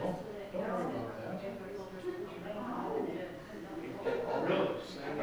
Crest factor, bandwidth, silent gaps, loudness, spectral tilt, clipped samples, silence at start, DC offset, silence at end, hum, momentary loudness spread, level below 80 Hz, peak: 18 dB; over 20 kHz; none; -38 LUFS; -6.5 dB/octave; under 0.1%; 0 s; under 0.1%; 0 s; none; 11 LU; -64 dBFS; -20 dBFS